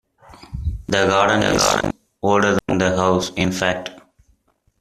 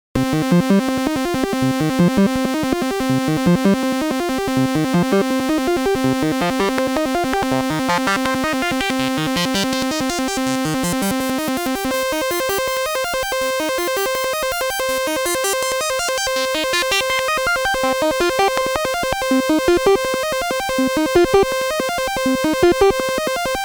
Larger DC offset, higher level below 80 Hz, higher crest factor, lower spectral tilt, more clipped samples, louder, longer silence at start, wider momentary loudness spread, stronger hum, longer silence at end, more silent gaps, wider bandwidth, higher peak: neither; about the same, -38 dBFS vs -42 dBFS; about the same, 18 dB vs 16 dB; about the same, -4 dB/octave vs -4 dB/octave; neither; about the same, -19 LUFS vs -18 LUFS; first, 0.3 s vs 0.15 s; first, 13 LU vs 5 LU; neither; first, 0.8 s vs 0 s; neither; second, 14.5 kHz vs over 20 kHz; about the same, -2 dBFS vs -2 dBFS